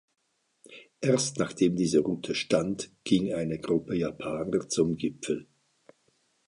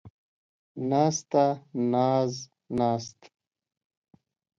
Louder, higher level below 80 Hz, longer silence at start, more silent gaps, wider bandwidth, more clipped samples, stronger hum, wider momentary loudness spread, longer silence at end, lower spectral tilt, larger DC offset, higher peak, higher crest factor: about the same, -28 LUFS vs -27 LUFS; first, -60 dBFS vs -66 dBFS; first, 0.7 s vs 0.05 s; second, none vs 0.10-0.75 s; first, 11.5 kHz vs 7.8 kHz; neither; neither; second, 8 LU vs 13 LU; second, 1.05 s vs 1.5 s; about the same, -5 dB/octave vs -6 dB/octave; neither; about the same, -10 dBFS vs -10 dBFS; about the same, 20 dB vs 20 dB